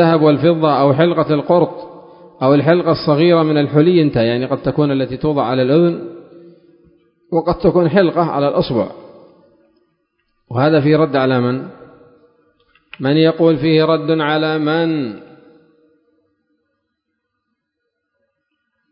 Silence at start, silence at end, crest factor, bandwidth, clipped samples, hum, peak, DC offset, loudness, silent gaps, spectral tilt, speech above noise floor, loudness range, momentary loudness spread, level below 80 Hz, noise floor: 0 s; 3.65 s; 16 dB; 5.4 kHz; under 0.1%; none; 0 dBFS; under 0.1%; -14 LUFS; none; -12 dB/octave; 61 dB; 4 LU; 9 LU; -48 dBFS; -74 dBFS